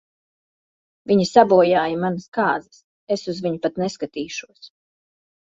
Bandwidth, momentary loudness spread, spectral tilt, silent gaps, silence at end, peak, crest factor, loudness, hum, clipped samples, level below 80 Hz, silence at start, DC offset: 8 kHz; 15 LU; -5.5 dB/octave; 2.28-2.32 s, 2.84-3.07 s; 0.85 s; -2 dBFS; 20 dB; -20 LUFS; none; under 0.1%; -62 dBFS; 1.1 s; under 0.1%